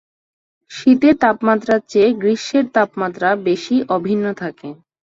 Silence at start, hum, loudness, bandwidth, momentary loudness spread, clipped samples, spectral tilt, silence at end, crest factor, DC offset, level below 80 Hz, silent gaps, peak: 0.7 s; none; -16 LUFS; 7.8 kHz; 13 LU; under 0.1%; -6 dB/octave; 0.3 s; 16 dB; under 0.1%; -58 dBFS; none; -2 dBFS